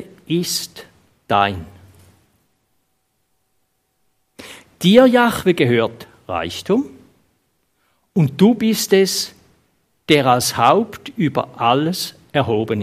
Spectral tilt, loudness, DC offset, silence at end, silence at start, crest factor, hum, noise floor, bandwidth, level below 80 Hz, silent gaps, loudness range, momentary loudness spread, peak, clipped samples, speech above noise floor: -5 dB/octave; -17 LUFS; under 0.1%; 0 s; 0 s; 18 dB; none; -68 dBFS; 15.5 kHz; -56 dBFS; none; 9 LU; 14 LU; 0 dBFS; under 0.1%; 52 dB